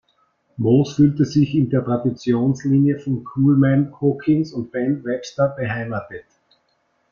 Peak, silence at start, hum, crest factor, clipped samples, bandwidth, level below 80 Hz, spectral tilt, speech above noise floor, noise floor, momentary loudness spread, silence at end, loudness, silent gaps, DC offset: -4 dBFS; 0.6 s; none; 16 dB; under 0.1%; 7.2 kHz; -54 dBFS; -8.5 dB/octave; 48 dB; -66 dBFS; 9 LU; 0.9 s; -19 LUFS; none; under 0.1%